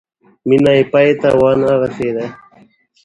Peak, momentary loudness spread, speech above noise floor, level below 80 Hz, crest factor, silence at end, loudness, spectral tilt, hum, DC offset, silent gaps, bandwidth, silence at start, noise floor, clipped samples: 0 dBFS; 12 LU; 37 dB; -48 dBFS; 14 dB; 0.7 s; -13 LUFS; -7.5 dB/octave; none; under 0.1%; none; 11 kHz; 0.45 s; -49 dBFS; under 0.1%